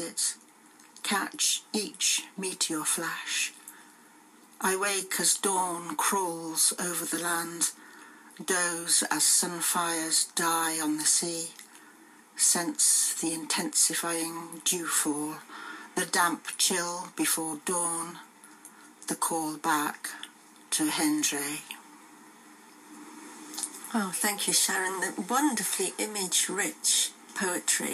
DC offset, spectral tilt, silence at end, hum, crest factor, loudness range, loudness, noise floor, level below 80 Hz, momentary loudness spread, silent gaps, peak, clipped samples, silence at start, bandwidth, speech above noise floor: under 0.1%; -1 dB/octave; 0 s; none; 20 dB; 6 LU; -27 LUFS; -56 dBFS; under -90 dBFS; 14 LU; none; -10 dBFS; under 0.1%; 0 s; 15.5 kHz; 27 dB